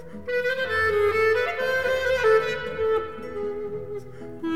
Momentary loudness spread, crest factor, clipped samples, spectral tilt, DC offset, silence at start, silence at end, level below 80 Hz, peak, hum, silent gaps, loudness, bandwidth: 13 LU; 14 dB; under 0.1%; -4.5 dB/octave; 0.7%; 0 s; 0 s; -50 dBFS; -10 dBFS; none; none; -24 LUFS; 15 kHz